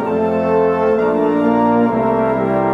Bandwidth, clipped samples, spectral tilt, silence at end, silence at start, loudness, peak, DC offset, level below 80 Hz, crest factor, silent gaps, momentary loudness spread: 6 kHz; under 0.1%; -9 dB/octave; 0 s; 0 s; -15 LUFS; -2 dBFS; under 0.1%; -46 dBFS; 12 dB; none; 2 LU